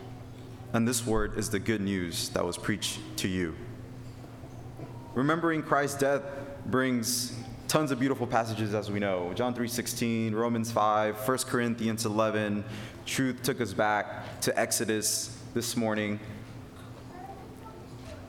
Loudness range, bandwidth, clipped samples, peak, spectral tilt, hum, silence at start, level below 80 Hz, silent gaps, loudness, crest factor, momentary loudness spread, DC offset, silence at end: 4 LU; 18.5 kHz; under 0.1%; -10 dBFS; -4 dB/octave; none; 0 s; -52 dBFS; none; -30 LUFS; 20 dB; 18 LU; under 0.1%; 0 s